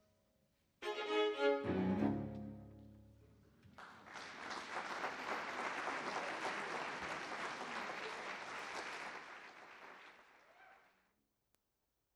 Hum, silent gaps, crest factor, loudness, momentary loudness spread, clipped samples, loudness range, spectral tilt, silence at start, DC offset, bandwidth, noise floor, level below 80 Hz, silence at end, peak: none; none; 20 dB; -42 LUFS; 19 LU; under 0.1%; 9 LU; -5 dB/octave; 0.8 s; under 0.1%; 14 kHz; -86 dBFS; -72 dBFS; 1.35 s; -24 dBFS